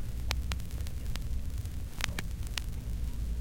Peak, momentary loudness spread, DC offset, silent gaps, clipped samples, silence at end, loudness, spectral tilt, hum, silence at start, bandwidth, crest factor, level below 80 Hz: -6 dBFS; 4 LU; under 0.1%; none; under 0.1%; 0 s; -38 LUFS; -4 dB/octave; none; 0 s; 17 kHz; 28 dB; -36 dBFS